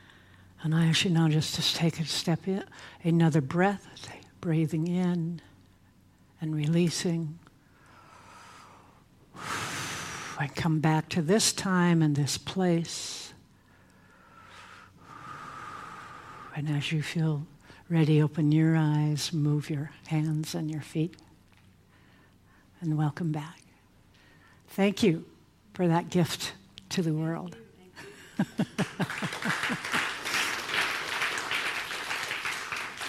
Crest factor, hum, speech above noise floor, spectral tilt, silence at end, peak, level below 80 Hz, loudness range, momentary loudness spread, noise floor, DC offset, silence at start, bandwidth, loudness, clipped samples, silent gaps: 20 dB; none; 33 dB; -5 dB/octave; 0 s; -10 dBFS; -64 dBFS; 9 LU; 19 LU; -60 dBFS; under 0.1%; 0.6 s; 15 kHz; -29 LUFS; under 0.1%; none